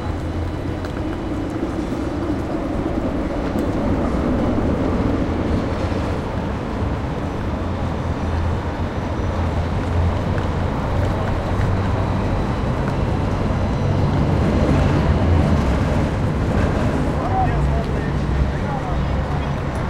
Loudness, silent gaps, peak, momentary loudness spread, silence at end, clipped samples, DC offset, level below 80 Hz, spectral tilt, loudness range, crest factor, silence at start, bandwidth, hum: -21 LUFS; none; -4 dBFS; 7 LU; 0 s; under 0.1%; under 0.1%; -26 dBFS; -8 dB/octave; 5 LU; 16 dB; 0 s; 11.5 kHz; none